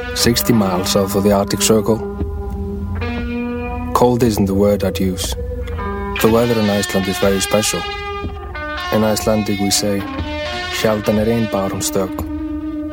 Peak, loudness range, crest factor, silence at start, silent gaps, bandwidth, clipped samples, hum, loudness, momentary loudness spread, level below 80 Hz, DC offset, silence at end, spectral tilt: 0 dBFS; 2 LU; 16 dB; 0 s; none; 17 kHz; under 0.1%; none; -17 LUFS; 10 LU; -32 dBFS; under 0.1%; 0 s; -4.5 dB/octave